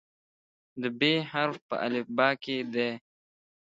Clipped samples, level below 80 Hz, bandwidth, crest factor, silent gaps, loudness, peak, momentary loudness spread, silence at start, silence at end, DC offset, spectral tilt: under 0.1%; -78 dBFS; 7.8 kHz; 24 dB; 1.62-1.69 s; -29 LUFS; -8 dBFS; 10 LU; 0.75 s; 0.7 s; under 0.1%; -6 dB/octave